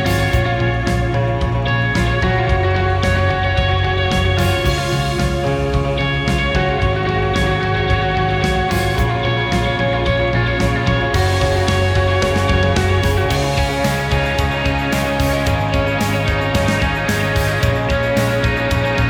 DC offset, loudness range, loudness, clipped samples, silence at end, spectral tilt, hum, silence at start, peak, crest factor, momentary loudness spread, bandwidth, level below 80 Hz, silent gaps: under 0.1%; 1 LU; -17 LUFS; under 0.1%; 0 s; -5.5 dB/octave; none; 0 s; -2 dBFS; 14 dB; 2 LU; 20 kHz; -26 dBFS; none